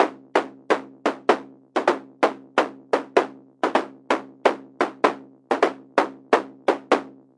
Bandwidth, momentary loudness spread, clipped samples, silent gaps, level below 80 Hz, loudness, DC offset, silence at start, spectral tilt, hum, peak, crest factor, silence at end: 11.5 kHz; 5 LU; under 0.1%; none; -84 dBFS; -24 LUFS; under 0.1%; 0 s; -4 dB/octave; none; 0 dBFS; 24 dB; 0.25 s